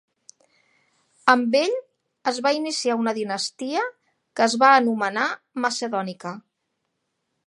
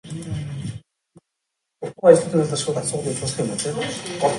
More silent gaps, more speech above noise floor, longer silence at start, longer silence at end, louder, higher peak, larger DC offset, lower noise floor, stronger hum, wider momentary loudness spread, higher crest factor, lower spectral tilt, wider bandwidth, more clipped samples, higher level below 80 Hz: neither; second, 55 dB vs 60 dB; first, 1.25 s vs 0.05 s; first, 1.05 s vs 0 s; about the same, -22 LUFS vs -21 LUFS; about the same, 0 dBFS vs 0 dBFS; neither; about the same, -77 dBFS vs -80 dBFS; neither; second, 15 LU vs 19 LU; about the same, 24 dB vs 22 dB; second, -3 dB/octave vs -5 dB/octave; about the same, 11.5 kHz vs 11.5 kHz; neither; second, -76 dBFS vs -52 dBFS